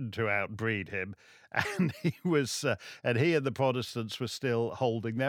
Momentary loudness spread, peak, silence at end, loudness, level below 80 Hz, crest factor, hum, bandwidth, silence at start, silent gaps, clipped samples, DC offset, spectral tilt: 7 LU; -10 dBFS; 0 s; -31 LUFS; -68 dBFS; 20 dB; none; 17.5 kHz; 0 s; none; under 0.1%; under 0.1%; -5.5 dB/octave